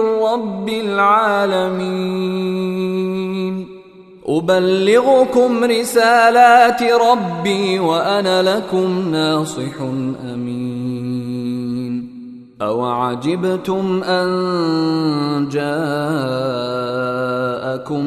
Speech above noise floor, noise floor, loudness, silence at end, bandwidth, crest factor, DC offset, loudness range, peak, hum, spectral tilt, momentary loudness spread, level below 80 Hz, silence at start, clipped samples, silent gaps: 24 dB; -40 dBFS; -17 LUFS; 0 s; 14 kHz; 16 dB; under 0.1%; 9 LU; 0 dBFS; none; -5.5 dB/octave; 11 LU; -58 dBFS; 0 s; under 0.1%; none